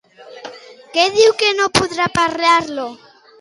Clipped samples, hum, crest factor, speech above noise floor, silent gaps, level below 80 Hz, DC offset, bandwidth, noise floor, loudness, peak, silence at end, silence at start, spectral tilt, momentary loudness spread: under 0.1%; none; 16 dB; 21 dB; none; -50 dBFS; under 0.1%; 11.5 kHz; -36 dBFS; -15 LUFS; 0 dBFS; 0.45 s; 0.2 s; -3 dB/octave; 22 LU